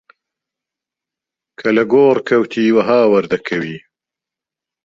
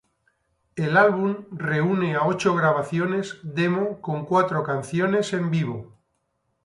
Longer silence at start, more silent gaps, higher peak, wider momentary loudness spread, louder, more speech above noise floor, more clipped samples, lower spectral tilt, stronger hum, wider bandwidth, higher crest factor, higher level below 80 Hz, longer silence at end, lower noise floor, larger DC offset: first, 1.6 s vs 0.75 s; neither; first, -2 dBFS vs -6 dBFS; about the same, 11 LU vs 10 LU; first, -14 LUFS vs -23 LUFS; first, 73 dB vs 50 dB; neither; about the same, -7 dB/octave vs -6.5 dB/octave; neither; second, 7.6 kHz vs 11.5 kHz; about the same, 16 dB vs 18 dB; about the same, -60 dBFS vs -64 dBFS; first, 1.05 s vs 0.8 s; first, -86 dBFS vs -73 dBFS; neither